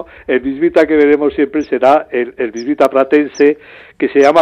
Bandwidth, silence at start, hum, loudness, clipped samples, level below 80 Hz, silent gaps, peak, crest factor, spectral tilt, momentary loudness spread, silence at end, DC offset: 9.6 kHz; 0 s; none; -13 LUFS; under 0.1%; -50 dBFS; none; 0 dBFS; 12 dB; -5.5 dB/octave; 9 LU; 0 s; under 0.1%